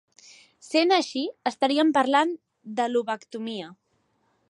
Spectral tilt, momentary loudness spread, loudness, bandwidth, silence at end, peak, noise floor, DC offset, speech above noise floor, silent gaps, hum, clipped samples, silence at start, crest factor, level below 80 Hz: -3.5 dB/octave; 14 LU; -25 LUFS; 11.5 kHz; 0.75 s; -8 dBFS; -70 dBFS; under 0.1%; 46 dB; none; none; under 0.1%; 0.65 s; 18 dB; -80 dBFS